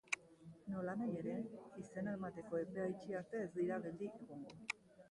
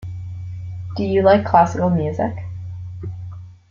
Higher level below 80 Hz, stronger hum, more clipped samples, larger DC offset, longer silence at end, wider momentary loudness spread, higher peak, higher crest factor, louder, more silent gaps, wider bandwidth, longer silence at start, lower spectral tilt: second, -78 dBFS vs -48 dBFS; neither; neither; neither; about the same, 0.05 s vs 0.15 s; second, 10 LU vs 18 LU; second, -22 dBFS vs -2 dBFS; first, 24 dB vs 18 dB; second, -45 LUFS vs -17 LUFS; neither; first, 11.5 kHz vs 7.4 kHz; about the same, 0.05 s vs 0 s; second, -6 dB/octave vs -8 dB/octave